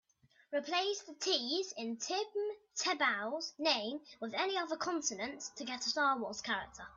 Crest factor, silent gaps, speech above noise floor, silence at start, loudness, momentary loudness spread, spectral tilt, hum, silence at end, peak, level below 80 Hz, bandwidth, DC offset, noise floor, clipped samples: 20 dB; none; 28 dB; 0.5 s; -36 LUFS; 8 LU; -1 dB/octave; none; 0 s; -16 dBFS; -76 dBFS; 8 kHz; under 0.1%; -65 dBFS; under 0.1%